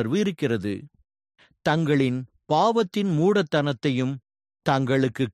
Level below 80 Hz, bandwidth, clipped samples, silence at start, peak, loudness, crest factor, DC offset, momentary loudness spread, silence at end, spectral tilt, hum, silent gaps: -62 dBFS; 13 kHz; under 0.1%; 0 s; -6 dBFS; -24 LUFS; 18 dB; under 0.1%; 9 LU; 0.05 s; -6.5 dB/octave; none; none